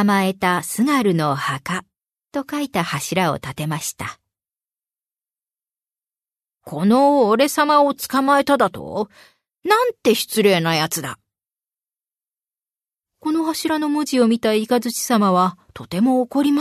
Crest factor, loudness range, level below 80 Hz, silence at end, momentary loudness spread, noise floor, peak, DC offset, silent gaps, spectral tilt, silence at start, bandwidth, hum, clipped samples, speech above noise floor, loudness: 18 dB; 9 LU; -60 dBFS; 0 s; 13 LU; under -90 dBFS; -2 dBFS; under 0.1%; none; -4.5 dB/octave; 0 s; 13.5 kHz; none; under 0.1%; over 72 dB; -19 LUFS